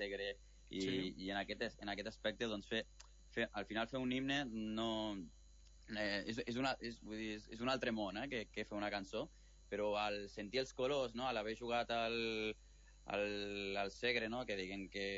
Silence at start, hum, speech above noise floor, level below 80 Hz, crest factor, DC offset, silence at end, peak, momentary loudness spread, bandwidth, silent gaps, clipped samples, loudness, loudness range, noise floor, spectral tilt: 0 s; none; 20 dB; -64 dBFS; 18 dB; under 0.1%; 0 s; -24 dBFS; 8 LU; 7.6 kHz; none; under 0.1%; -42 LUFS; 2 LU; -63 dBFS; -2.5 dB/octave